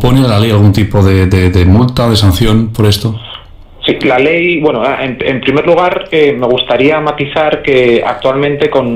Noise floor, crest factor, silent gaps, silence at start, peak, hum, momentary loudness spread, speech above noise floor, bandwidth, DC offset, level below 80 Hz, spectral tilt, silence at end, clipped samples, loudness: -31 dBFS; 10 dB; none; 0 s; 0 dBFS; none; 6 LU; 23 dB; 16 kHz; under 0.1%; -28 dBFS; -6.5 dB/octave; 0 s; 0.1%; -10 LUFS